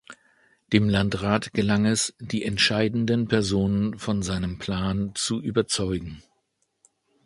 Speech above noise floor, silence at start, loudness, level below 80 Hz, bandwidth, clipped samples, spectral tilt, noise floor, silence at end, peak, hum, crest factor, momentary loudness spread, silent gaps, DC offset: 49 dB; 0.1 s; -24 LUFS; -46 dBFS; 11.5 kHz; under 0.1%; -4.5 dB/octave; -73 dBFS; 1.05 s; -4 dBFS; none; 22 dB; 7 LU; none; under 0.1%